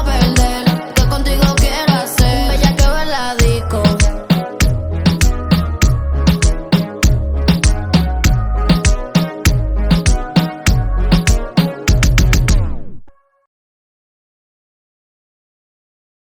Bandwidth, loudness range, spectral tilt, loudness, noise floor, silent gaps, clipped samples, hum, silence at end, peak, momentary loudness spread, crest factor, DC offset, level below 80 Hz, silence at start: 18.5 kHz; 4 LU; -5 dB/octave; -15 LUFS; -36 dBFS; none; under 0.1%; none; 3.3 s; 0 dBFS; 4 LU; 14 dB; under 0.1%; -18 dBFS; 0 s